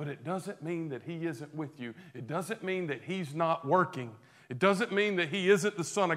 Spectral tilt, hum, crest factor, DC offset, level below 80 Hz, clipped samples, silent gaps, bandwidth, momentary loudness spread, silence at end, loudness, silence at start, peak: -5 dB/octave; none; 22 dB; under 0.1%; -80 dBFS; under 0.1%; none; 15 kHz; 14 LU; 0 s; -32 LUFS; 0 s; -10 dBFS